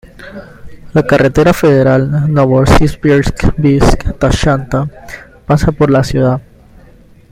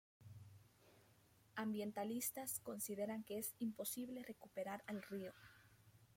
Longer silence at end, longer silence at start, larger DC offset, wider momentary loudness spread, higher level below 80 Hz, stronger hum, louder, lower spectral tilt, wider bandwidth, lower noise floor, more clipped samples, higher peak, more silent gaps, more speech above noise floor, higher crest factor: first, 0.9 s vs 0.05 s; second, 0.05 s vs 0.2 s; neither; about the same, 20 LU vs 20 LU; first, -22 dBFS vs -84 dBFS; neither; first, -11 LUFS vs -47 LUFS; first, -7 dB/octave vs -4 dB/octave; about the same, 16 kHz vs 16.5 kHz; second, -40 dBFS vs -72 dBFS; neither; first, 0 dBFS vs -30 dBFS; neither; first, 30 dB vs 25 dB; second, 12 dB vs 18 dB